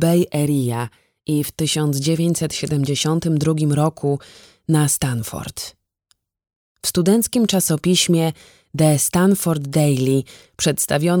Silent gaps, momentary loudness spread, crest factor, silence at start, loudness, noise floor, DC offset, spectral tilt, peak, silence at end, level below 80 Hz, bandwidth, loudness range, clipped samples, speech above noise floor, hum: 6.56-6.75 s; 11 LU; 16 dB; 0 s; -19 LUFS; -65 dBFS; under 0.1%; -5 dB/octave; -4 dBFS; 0 s; -50 dBFS; over 20 kHz; 4 LU; under 0.1%; 47 dB; none